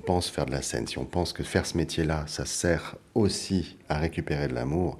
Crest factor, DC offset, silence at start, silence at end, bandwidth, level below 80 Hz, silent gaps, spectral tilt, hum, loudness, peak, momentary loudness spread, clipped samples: 20 dB; under 0.1%; 0 s; 0 s; 14.5 kHz; -42 dBFS; none; -5 dB/octave; none; -29 LUFS; -8 dBFS; 4 LU; under 0.1%